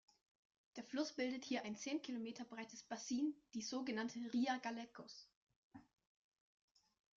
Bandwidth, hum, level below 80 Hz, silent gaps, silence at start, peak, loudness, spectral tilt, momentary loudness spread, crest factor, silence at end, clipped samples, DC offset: 7.6 kHz; none; -88 dBFS; 5.36-5.47 s, 5.56-5.71 s; 0.75 s; -28 dBFS; -45 LUFS; -3 dB/octave; 16 LU; 18 dB; 1.35 s; under 0.1%; under 0.1%